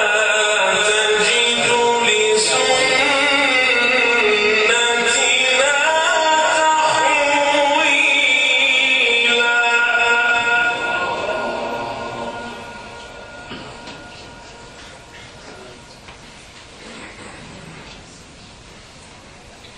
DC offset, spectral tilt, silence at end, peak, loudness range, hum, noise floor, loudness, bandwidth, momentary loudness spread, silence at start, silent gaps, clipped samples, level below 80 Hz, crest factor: under 0.1%; -0.5 dB/octave; 0.05 s; -2 dBFS; 19 LU; none; -41 dBFS; -14 LUFS; 11 kHz; 22 LU; 0 s; none; under 0.1%; -52 dBFS; 16 dB